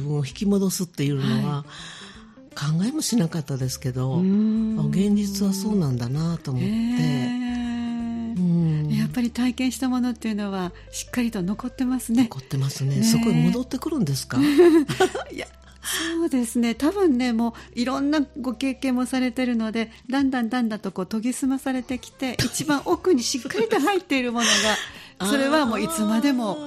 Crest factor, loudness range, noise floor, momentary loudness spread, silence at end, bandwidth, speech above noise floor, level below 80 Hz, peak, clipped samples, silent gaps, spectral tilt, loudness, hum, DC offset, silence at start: 20 dB; 4 LU; -45 dBFS; 8 LU; 0 s; 14 kHz; 22 dB; -50 dBFS; -4 dBFS; under 0.1%; none; -5 dB/octave; -23 LUFS; none; under 0.1%; 0 s